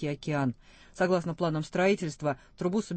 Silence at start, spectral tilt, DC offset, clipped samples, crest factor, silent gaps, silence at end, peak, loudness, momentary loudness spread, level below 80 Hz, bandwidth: 0 s; -6.5 dB/octave; under 0.1%; under 0.1%; 16 dB; none; 0 s; -14 dBFS; -30 LUFS; 7 LU; -58 dBFS; 8.8 kHz